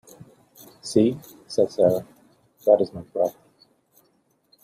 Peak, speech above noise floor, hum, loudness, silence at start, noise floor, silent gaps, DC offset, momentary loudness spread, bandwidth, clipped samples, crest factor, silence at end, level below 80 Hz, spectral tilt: -4 dBFS; 45 dB; none; -23 LUFS; 0.85 s; -66 dBFS; none; under 0.1%; 10 LU; 15 kHz; under 0.1%; 22 dB; 1.35 s; -64 dBFS; -6.5 dB/octave